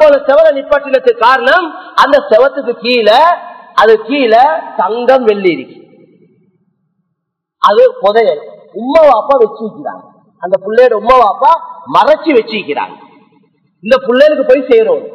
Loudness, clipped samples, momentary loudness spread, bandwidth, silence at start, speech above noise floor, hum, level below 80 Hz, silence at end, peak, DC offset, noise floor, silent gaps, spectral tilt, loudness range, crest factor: -9 LUFS; 3%; 11 LU; 5.4 kHz; 0 s; 62 dB; none; -48 dBFS; 0 s; 0 dBFS; under 0.1%; -71 dBFS; none; -5.5 dB/octave; 4 LU; 10 dB